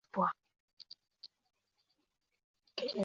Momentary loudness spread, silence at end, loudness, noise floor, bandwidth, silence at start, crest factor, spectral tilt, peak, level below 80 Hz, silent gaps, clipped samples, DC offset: 21 LU; 0 s; -39 LUFS; -81 dBFS; 7.4 kHz; 0.15 s; 22 dB; -3.5 dB/octave; -20 dBFS; -84 dBFS; 0.60-0.77 s, 2.44-2.54 s; under 0.1%; under 0.1%